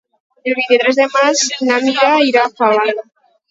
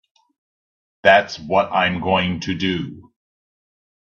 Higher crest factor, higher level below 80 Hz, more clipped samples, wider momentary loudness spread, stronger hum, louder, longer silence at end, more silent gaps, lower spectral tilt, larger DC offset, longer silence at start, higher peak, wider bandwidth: second, 14 dB vs 20 dB; second, -68 dBFS vs -56 dBFS; neither; about the same, 8 LU vs 9 LU; neither; first, -13 LUFS vs -18 LUFS; second, 0.5 s vs 1.05 s; neither; second, -1.5 dB/octave vs -5.5 dB/octave; neither; second, 0.45 s vs 1.05 s; about the same, 0 dBFS vs 0 dBFS; about the same, 8 kHz vs 7.4 kHz